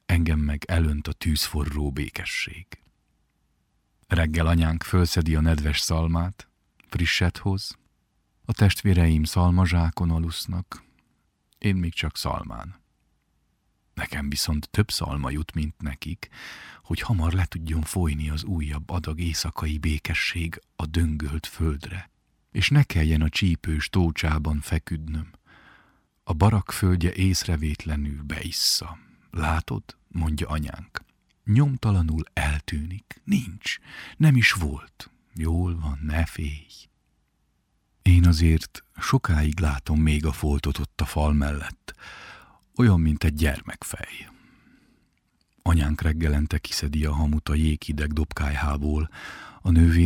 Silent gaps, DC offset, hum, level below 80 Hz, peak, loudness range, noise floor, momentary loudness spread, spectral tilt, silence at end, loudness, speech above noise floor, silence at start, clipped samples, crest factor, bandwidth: none; under 0.1%; none; -32 dBFS; -4 dBFS; 5 LU; -70 dBFS; 15 LU; -5.5 dB/octave; 0 s; -25 LUFS; 46 dB; 0.1 s; under 0.1%; 20 dB; 16.5 kHz